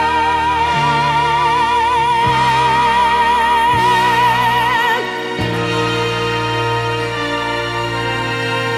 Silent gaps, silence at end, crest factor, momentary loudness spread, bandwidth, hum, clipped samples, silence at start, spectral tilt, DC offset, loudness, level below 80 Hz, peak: none; 0 s; 12 dB; 6 LU; 15 kHz; none; under 0.1%; 0 s; -4.5 dB/octave; under 0.1%; -15 LUFS; -38 dBFS; -4 dBFS